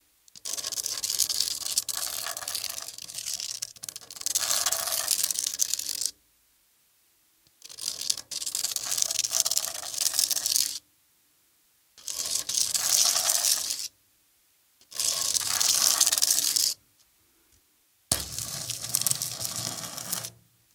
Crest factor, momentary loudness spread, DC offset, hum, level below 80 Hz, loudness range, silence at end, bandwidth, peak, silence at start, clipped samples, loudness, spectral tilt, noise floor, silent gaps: 30 dB; 14 LU; under 0.1%; none; -64 dBFS; 6 LU; 0.45 s; 19 kHz; 0 dBFS; 0.35 s; under 0.1%; -26 LUFS; 1.5 dB/octave; -66 dBFS; none